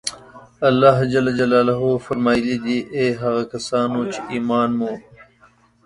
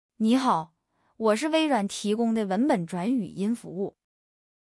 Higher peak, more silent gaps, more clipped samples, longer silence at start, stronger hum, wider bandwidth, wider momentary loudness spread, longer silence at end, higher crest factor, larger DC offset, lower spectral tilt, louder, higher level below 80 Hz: first, 0 dBFS vs -10 dBFS; neither; neither; second, 0.05 s vs 0.2 s; neither; about the same, 11.5 kHz vs 12 kHz; about the same, 10 LU vs 9 LU; about the same, 0.85 s vs 0.85 s; about the same, 20 dB vs 16 dB; neither; about the same, -6 dB/octave vs -5.5 dB/octave; first, -19 LUFS vs -26 LUFS; first, -54 dBFS vs -72 dBFS